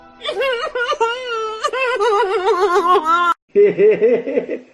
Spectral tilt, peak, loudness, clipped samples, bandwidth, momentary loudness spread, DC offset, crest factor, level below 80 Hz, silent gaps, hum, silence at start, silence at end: -4 dB/octave; -4 dBFS; -16 LUFS; under 0.1%; 11.5 kHz; 9 LU; under 0.1%; 12 dB; -58 dBFS; 3.42-3.48 s; none; 0.2 s; 0.1 s